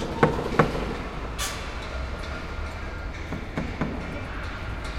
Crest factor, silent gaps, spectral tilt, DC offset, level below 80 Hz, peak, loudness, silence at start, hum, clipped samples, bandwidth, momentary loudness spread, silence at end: 28 dB; none; -5.5 dB/octave; under 0.1%; -36 dBFS; -2 dBFS; -30 LUFS; 0 s; none; under 0.1%; 16.5 kHz; 11 LU; 0 s